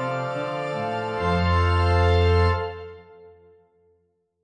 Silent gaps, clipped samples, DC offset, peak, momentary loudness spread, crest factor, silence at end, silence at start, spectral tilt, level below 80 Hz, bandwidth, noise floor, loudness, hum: none; under 0.1%; under 0.1%; -8 dBFS; 10 LU; 14 dB; 1.15 s; 0 s; -7 dB/octave; -36 dBFS; 9 kHz; -68 dBFS; -23 LUFS; none